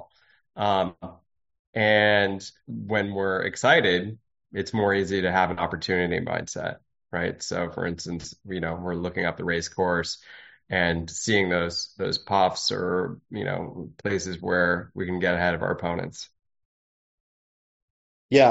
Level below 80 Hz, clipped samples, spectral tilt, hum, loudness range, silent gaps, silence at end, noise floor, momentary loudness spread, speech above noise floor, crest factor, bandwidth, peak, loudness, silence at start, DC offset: -54 dBFS; under 0.1%; -3 dB/octave; none; 6 LU; 1.59-1.73 s, 16.65-18.29 s; 0 s; under -90 dBFS; 14 LU; over 64 dB; 22 dB; 8 kHz; -4 dBFS; -25 LUFS; 0 s; under 0.1%